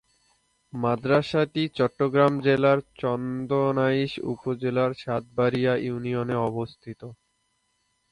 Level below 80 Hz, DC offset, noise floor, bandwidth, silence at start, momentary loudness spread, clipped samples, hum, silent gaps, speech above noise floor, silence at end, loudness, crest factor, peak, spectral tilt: -60 dBFS; under 0.1%; -72 dBFS; 11 kHz; 0.75 s; 11 LU; under 0.1%; none; none; 48 dB; 1 s; -25 LUFS; 18 dB; -8 dBFS; -8 dB/octave